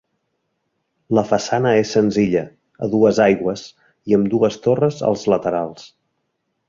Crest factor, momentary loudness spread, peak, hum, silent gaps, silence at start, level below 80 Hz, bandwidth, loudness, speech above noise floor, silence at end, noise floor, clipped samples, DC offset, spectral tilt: 18 dB; 10 LU; -2 dBFS; none; none; 1.1 s; -54 dBFS; 7.6 kHz; -18 LUFS; 55 dB; 0.8 s; -72 dBFS; under 0.1%; under 0.1%; -6.5 dB/octave